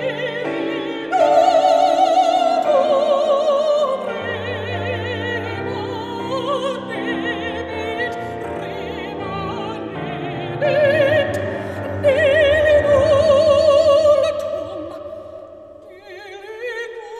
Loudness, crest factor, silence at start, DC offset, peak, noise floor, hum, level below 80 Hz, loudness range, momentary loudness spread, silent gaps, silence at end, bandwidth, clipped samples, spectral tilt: -18 LUFS; 14 dB; 0 s; under 0.1%; -4 dBFS; -40 dBFS; none; -46 dBFS; 9 LU; 14 LU; none; 0 s; 11 kHz; under 0.1%; -5.5 dB/octave